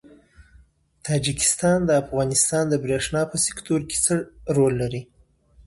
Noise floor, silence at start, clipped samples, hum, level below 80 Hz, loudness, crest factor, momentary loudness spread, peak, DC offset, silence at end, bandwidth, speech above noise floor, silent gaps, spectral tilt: -55 dBFS; 1.05 s; under 0.1%; none; -48 dBFS; -22 LUFS; 18 dB; 7 LU; -6 dBFS; under 0.1%; 0.65 s; 12 kHz; 33 dB; none; -4 dB/octave